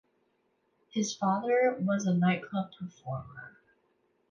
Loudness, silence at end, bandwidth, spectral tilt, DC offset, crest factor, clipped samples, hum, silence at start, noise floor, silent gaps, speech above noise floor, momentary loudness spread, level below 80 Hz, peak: -30 LUFS; 0.85 s; 7.4 kHz; -6 dB/octave; under 0.1%; 16 dB; under 0.1%; none; 0.95 s; -74 dBFS; none; 44 dB; 14 LU; -70 dBFS; -16 dBFS